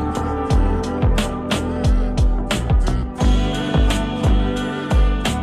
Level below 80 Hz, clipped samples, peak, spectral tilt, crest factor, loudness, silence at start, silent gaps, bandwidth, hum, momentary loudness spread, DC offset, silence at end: -20 dBFS; under 0.1%; -8 dBFS; -6 dB/octave; 10 dB; -20 LUFS; 0 s; none; 13.5 kHz; none; 4 LU; under 0.1%; 0 s